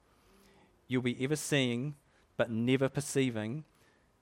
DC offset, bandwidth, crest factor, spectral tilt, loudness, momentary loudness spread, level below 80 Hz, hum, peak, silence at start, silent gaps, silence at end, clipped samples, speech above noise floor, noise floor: under 0.1%; 16 kHz; 20 dB; -5 dB/octave; -33 LUFS; 12 LU; -70 dBFS; none; -14 dBFS; 0.9 s; none; 0.6 s; under 0.1%; 32 dB; -64 dBFS